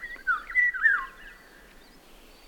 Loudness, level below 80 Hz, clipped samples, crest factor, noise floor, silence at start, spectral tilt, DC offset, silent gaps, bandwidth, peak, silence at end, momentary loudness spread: -24 LUFS; -54 dBFS; under 0.1%; 18 dB; -52 dBFS; 0 s; -1.5 dB/octave; under 0.1%; none; 18 kHz; -12 dBFS; 1.15 s; 8 LU